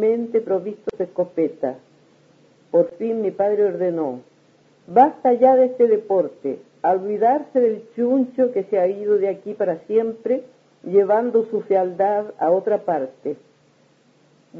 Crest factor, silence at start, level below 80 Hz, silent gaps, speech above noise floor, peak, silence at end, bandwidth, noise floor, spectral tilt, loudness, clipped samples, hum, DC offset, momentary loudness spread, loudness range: 18 dB; 0 s; -72 dBFS; none; 38 dB; -2 dBFS; 0 s; 6.2 kHz; -57 dBFS; -9 dB/octave; -20 LUFS; under 0.1%; none; under 0.1%; 12 LU; 5 LU